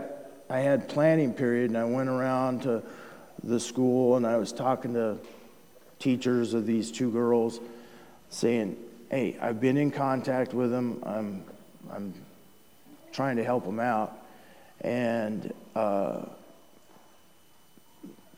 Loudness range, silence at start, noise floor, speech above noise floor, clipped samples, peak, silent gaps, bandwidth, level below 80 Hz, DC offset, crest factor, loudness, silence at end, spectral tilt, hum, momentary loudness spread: 6 LU; 0 s; -61 dBFS; 34 dB; under 0.1%; -12 dBFS; none; 19 kHz; -78 dBFS; 0.1%; 18 dB; -28 LUFS; 0.25 s; -6.5 dB/octave; none; 18 LU